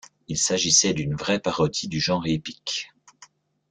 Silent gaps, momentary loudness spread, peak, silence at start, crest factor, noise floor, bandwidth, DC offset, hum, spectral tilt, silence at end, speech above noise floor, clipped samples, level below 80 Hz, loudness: none; 12 LU; -4 dBFS; 0.3 s; 20 dB; -54 dBFS; 10.5 kHz; under 0.1%; none; -3 dB/octave; 0.45 s; 30 dB; under 0.1%; -54 dBFS; -23 LUFS